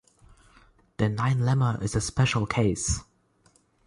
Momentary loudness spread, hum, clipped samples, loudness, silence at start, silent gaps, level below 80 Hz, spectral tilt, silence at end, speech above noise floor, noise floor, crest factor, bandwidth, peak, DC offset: 5 LU; none; under 0.1%; -26 LUFS; 1 s; none; -44 dBFS; -5 dB/octave; 0.85 s; 39 dB; -64 dBFS; 16 dB; 11.5 kHz; -10 dBFS; under 0.1%